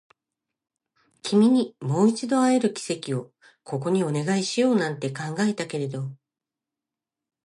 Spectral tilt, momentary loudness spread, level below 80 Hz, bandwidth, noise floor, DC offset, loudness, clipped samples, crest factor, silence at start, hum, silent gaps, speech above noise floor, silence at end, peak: -5.5 dB/octave; 11 LU; -74 dBFS; 11.5 kHz; -88 dBFS; under 0.1%; -24 LUFS; under 0.1%; 18 dB; 1.25 s; none; none; 65 dB; 1.3 s; -8 dBFS